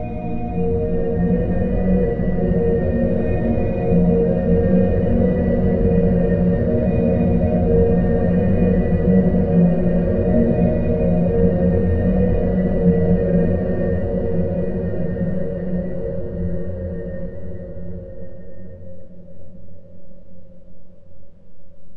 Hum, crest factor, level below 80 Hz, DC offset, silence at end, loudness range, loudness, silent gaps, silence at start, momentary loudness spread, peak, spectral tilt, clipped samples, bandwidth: none; 14 dB; -28 dBFS; under 0.1%; 0 s; 13 LU; -19 LUFS; none; 0 s; 12 LU; -4 dBFS; -12.5 dB/octave; under 0.1%; 3.1 kHz